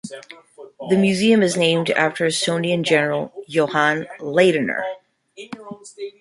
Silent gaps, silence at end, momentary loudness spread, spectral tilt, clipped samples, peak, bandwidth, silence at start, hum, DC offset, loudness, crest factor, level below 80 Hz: none; 0.1 s; 20 LU; -4.5 dB/octave; under 0.1%; -2 dBFS; 11.5 kHz; 0.05 s; none; under 0.1%; -19 LUFS; 18 dB; -64 dBFS